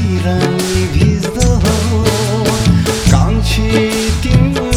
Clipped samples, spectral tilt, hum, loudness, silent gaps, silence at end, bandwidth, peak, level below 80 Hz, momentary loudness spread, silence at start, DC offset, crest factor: 0.2%; -5.5 dB/octave; none; -13 LUFS; none; 0 s; 18.5 kHz; 0 dBFS; -20 dBFS; 3 LU; 0 s; under 0.1%; 12 dB